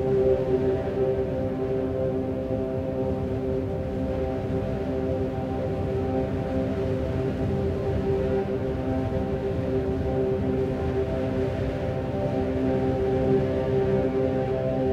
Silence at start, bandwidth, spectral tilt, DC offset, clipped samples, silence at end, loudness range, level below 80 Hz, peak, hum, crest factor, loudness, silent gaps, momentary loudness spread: 0 s; 7.8 kHz; -9 dB/octave; under 0.1%; under 0.1%; 0 s; 3 LU; -38 dBFS; -12 dBFS; none; 14 dB; -26 LUFS; none; 5 LU